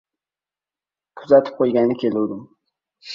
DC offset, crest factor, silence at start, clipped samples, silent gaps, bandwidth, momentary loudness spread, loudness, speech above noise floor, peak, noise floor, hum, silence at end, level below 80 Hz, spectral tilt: under 0.1%; 20 dB; 1.15 s; under 0.1%; none; 7.2 kHz; 10 LU; -18 LUFS; over 72 dB; -2 dBFS; under -90 dBFS; none; 0 s; -66 dBFS; -7.5 dB/octave